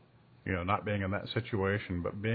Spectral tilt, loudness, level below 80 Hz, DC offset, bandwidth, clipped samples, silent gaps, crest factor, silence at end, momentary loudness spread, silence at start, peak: -5 dB/octave; -34 LUFS; -58 dBFS; under 0.1%; 4.8 kHz; under 0.1%; none; 20 dB; 0 s; 5 LU; 0.45 s; -14 dBFS